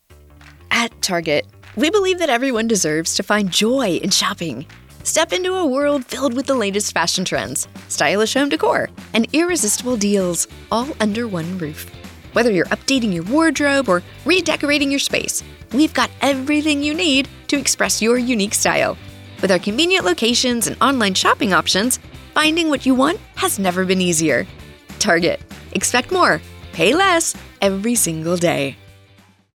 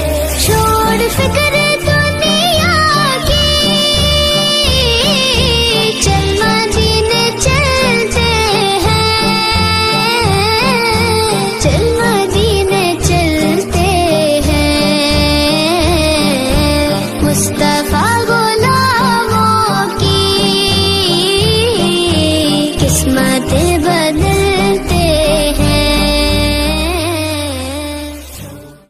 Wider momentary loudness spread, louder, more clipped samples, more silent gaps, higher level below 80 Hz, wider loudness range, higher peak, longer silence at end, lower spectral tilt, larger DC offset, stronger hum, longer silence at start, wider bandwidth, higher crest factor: first, 7 LU vs 3 LU; second, -17 LUFS vs -11 LUFS; neither; neither; second, -46 dBFS vs -22 dBFS; about the same, 3 LU vs 2 LU; about the same, -2 dBFS vs 0 dBFS; first, 0.8 s vs 0.15 s; about the same, -3 dB/octave vs -4 dB/octave; neither; neither; first, 0.5 s vs 0 s; first, 18 kHz vs 15.5 kHz; about the same, 16 dB vs 12 dB